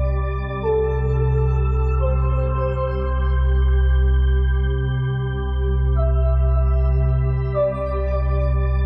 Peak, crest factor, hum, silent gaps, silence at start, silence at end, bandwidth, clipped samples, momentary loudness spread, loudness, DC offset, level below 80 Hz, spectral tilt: -8 dBFS; 10 dB; none; none; 0 s; 0 s; 3.7 kHz; under 0.1%; 4 LU; -21 LUFS; under 0.1%; -20 dBFS; -10.5 dB/octave